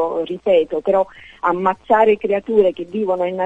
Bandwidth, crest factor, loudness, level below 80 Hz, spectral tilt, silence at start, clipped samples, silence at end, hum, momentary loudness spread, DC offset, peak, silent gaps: 7.8 kHz; 16 dB; -18 LUFS; -54 dBFS; -7.5 dB/octave; 0 s; under 0.1%; 0 s; none; 8 LU; under 0.1%; -2 dBFS; none